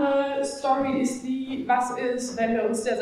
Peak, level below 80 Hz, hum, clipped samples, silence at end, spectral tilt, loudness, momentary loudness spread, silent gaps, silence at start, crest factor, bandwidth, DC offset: -12 dBFS; -60 dBFS; none; under 0.1%; 0 s; -4 dB/octave; -26 LUFS; 5 LU; none; 0 s; 14 dB; 13.5 kHz; under 0.1%